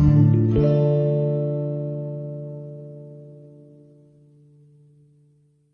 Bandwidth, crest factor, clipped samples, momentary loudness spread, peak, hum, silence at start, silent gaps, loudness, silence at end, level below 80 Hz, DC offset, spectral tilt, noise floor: 3.7 kHz; 18 dB; under 0.1%; 24 LU; -6 dBFS; none; 0 s; none; -21 LUFS; 2.25 s; -40 dBFS; under 0.1%; -11.5 dB/octave; -60 dBFS